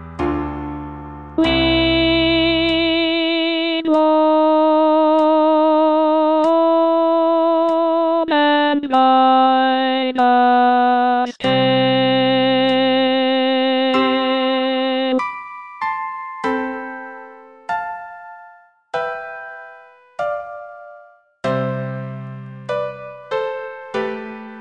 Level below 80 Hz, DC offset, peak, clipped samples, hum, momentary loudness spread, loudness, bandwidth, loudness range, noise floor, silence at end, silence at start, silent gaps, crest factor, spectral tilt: -42 dBFS; under 0.1%; -4 dBFS; under 0.1%; none; 17 LU; -16 LUFS; 7.4 kHz; 13 LU; -47 dBFS; 0 s; 0 s; none; 12 dB; -6.5 dB/octave